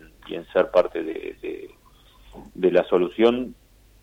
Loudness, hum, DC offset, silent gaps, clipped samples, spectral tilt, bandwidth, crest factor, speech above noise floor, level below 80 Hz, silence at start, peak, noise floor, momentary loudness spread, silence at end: -22 LUFS; none; under 0.1%; none; under 0.1%; -7 dB/octave; 9 kHz; 18 dB; 31 dB; -54 dBFS; 0.25 s; -6 dBFS; -53 dBFS; 16 LU; 0.5 s